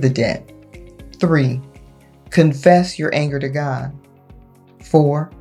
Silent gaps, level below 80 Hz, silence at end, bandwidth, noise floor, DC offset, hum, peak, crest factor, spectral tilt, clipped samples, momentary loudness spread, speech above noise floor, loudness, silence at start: none; -48 dBFS; 0.05 s; 11.5 kHz; -45 dBFS; under 0.1%; none; 0 dBFS; 18 dB; -7 dB/octave; under 0.1%; 12 LU; 29 dB; -17 LUFS; 0 s